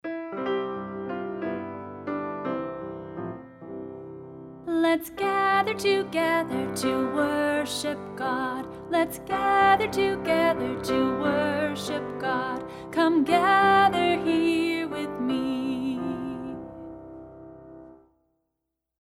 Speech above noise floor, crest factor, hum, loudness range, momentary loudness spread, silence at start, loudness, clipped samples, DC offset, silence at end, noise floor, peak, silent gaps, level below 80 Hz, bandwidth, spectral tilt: 59 dB; 18 dB; none; 11 LU; 19 LU; 0.05 s; -26 LUFS; under 0.1%; under 0.1%; 1.05 s; -83 dBFS; -8 dBFS; none; -58 dBFS; 16 kHz; -5 dB/octave